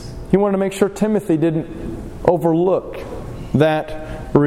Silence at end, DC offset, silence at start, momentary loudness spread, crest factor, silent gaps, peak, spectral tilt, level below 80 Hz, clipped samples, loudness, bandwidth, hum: 0 s; under 0.1%; 0 s; 14 LU; 18 dB; none; 0 dBFS; -7.5 dB/octave; -36 dBFS; under 0.1%; -18 LUFS; 15.5 kHz; none